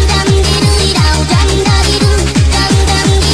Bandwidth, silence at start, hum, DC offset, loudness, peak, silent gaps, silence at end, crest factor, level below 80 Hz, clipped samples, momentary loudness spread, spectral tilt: 13.5 kHz; 0 s; none; under 0.1%; -10 LUFS; 0 dBFS; none; 0 s; 8 dB; -14 dBFS; under 0.1%; 1 LU; -4.5 dB/octave